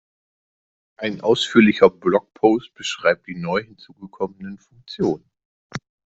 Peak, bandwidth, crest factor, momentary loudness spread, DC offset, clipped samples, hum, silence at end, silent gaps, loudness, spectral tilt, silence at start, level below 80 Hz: 0 dBFS; 8.2 kHz; 22 dB; 21 LU; under 0.1%; under 0.1%; none; 0.35 s; 5.45-5.70 s; -20 LUFS; -5.5 dB/octave; 1 s; -58 dBFS